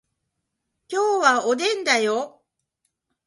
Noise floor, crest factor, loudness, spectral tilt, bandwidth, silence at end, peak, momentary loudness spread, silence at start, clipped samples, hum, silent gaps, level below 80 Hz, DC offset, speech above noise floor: -79 dBFS; 20 dB; -21 LUFS; -1.5 dB/octave; 11.5 kHz; 1 s; -4 dBFS; 10 LU; 0.9 s; under 0.1%; none; none; -76 dBFS; under 0.1%; 58 dB